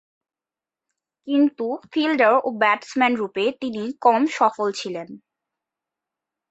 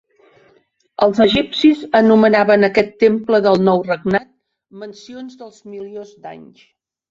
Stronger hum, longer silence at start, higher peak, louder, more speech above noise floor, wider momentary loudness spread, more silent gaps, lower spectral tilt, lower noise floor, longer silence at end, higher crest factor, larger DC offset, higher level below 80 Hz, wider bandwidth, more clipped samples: neither; first, 1.25 s vs 1 s; second, -4 dBFS vs 0 dBFS; second, -21 LUFS vs -14 LUFS; first, over 69 dB vs 42 dB; second, 11 LU vs 23 LU; neither; second, -4.5 dB/octave vs -6.5 dB/octave; first, under -90 dBFS vs -57 dBFS; first, 1.35 s vs 0.7 s; about the same, 20 dB vs 16 dB; neither; second, -72 dBFS vs -52 dBFS; about the same, 8.2 kHz vs 7.6 kHz; neither